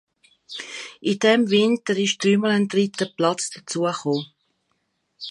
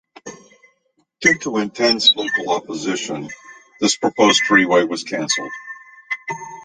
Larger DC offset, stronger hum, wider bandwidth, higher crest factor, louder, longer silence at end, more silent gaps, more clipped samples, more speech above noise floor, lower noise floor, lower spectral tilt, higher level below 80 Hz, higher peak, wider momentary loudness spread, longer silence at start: neither; neither; first, 11.5 kHz vs 10 kHz; about the same, 20 dB vs 18 dB; second, -21 LUFS vs -17 LUFS; about the same, 0 s vs 0 s; neither; neither; about the same, 51 dB vs 48 dB; first, -72 dBFS vs -65 dBFS; first, -4.5 dB/octave vs -2.5 dB/octave; second, -70 dBFS vs -62 dBFS; about the same, -4 dBFS vs -2 dBFS; second, 16 LU vs 22 LU; first, 0.5 s vs 0.25 s